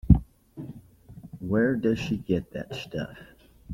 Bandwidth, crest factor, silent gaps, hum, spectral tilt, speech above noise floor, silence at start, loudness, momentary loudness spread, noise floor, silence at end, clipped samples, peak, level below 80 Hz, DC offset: 15.5 kHz; 24 dB; none; none; -8 dB/octave; 21 dB; 0.05 s; -27 LUFS; 23 LU; -48 dBFS; 0 s; under 0.1%; -4 dBFS; -36 dBFS; under 0.1%